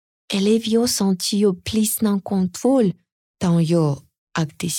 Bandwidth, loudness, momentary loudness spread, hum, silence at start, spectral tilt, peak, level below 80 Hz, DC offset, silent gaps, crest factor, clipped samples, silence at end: 18.5 kHz; -20 LUFS; 8 LU; none; 0.3 s; -5.5 dB/octave; -8 dBFS; -56 dBFS; under 0.1%; 3.12-3.34 s, 4.18-4.27 s; 12 dB; under 0.1%; 0 s